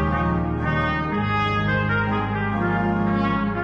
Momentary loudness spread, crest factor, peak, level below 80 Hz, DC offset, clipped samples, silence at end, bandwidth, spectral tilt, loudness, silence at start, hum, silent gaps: 2 LU; 12 dB; -10 dBFS; -36 dBFS; under 0.1%; under 0.1%; 0 s; 7 kHz; -8.5 dB/octave; -22 LUFS; 0 s; none; none